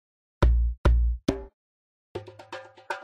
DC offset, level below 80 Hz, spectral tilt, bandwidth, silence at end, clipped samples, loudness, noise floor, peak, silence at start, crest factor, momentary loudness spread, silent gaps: under 0.1%; -28 dBFS; -7.5 dB/octave; 7.2 kHz; 0 s; under 0.1%; -27 LUFS; -44 dBFS; -8 dBFS; 0.4 s; 18 dB; 18 LU; 0.78-0.84 s, 1.54-2.15 s